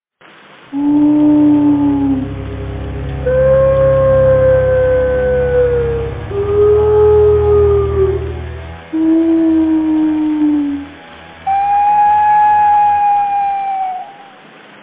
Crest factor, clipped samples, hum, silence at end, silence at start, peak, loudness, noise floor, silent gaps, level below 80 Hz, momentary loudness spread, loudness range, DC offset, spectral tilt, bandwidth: 10 dB; under 0.1%; none; 0.6 s; 0.7 s; -2 dBFS; -12 LUFS; -43 dBFS; none; -28 dBFS; 14 LU; 2 LU; under 0.1%; -12 dB/octave; 4 kHz